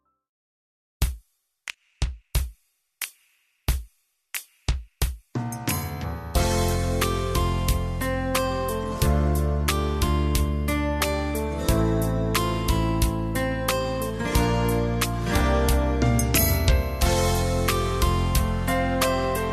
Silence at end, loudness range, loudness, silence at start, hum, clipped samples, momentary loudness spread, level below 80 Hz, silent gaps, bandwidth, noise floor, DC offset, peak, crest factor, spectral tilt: 0 s; 10 LU; -25 LUFS; 1 s; none; under 0.1%; 10 LU; -30 dBFS; none; 14 kHz; -66 dBFS; under 0.1%; -6 dBFS; 18 dB; -5 dB/octave